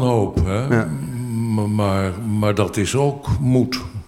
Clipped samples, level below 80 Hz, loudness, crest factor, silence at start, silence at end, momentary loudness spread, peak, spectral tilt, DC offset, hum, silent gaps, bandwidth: under 0.1%; -36 dBFS; -20 LUFS; 16 dB; 0 s; 0.05 s; 5 LU; -2 dBFS; -6.5 dB/octave; under 0.1%; none; none; 15.5 kHz